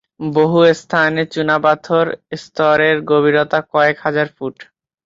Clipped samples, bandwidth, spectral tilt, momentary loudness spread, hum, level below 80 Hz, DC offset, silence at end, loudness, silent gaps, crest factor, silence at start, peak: under 0.1%; 7.8 kHz; -6 dB/octave; 9 LU; none; -58 dBFS; under 0.1%; 0.45 s; -15 LUFS; none; 14 dB; 0.2 s; -2 dBFS